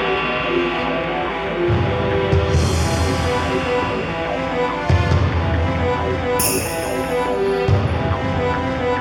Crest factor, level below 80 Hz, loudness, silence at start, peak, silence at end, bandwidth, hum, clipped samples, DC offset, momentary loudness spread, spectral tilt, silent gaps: 16 dB; -30 dBFS; -19 LUFS; 0 s; -2 dBFS; 0 s; 19 kHz; none; under 0.1%; under 0.1%; 4 LU; -5.5 dB/octave; none